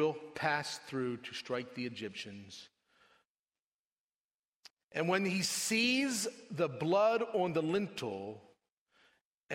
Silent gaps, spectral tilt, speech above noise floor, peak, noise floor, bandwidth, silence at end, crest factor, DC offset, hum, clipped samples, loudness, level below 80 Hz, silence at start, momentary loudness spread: 3.27-3.46 s, 3.62-4.63 s, 4.70-4.77 s, 4.84-4.89 s, 8.72-8.86 s, 9.21-9.49 s; -3.5 dB/octave; over 55 dB; -16 dBFS; under -90 dBFS; 16 kHz; 0 s; 20 dB; under 0.1%; none; under 0.1%; -34 LUFS; -78 dBFS; 0 s; 15 LU